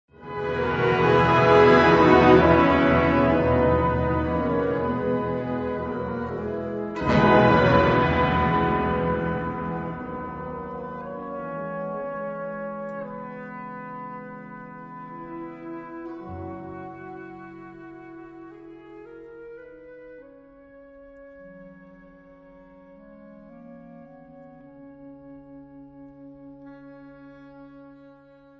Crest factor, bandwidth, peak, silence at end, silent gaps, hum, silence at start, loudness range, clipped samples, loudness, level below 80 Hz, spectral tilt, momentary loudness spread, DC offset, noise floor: 22 dB; 7.4 kHz; -4 dBFS; 0.65 s; none; none; 0.2 s; 25 LU; under 0.1%; -22 LUFS; -42 dBFS; -8 dB/octave; 27 LU; under 0.1%; -51 dBFS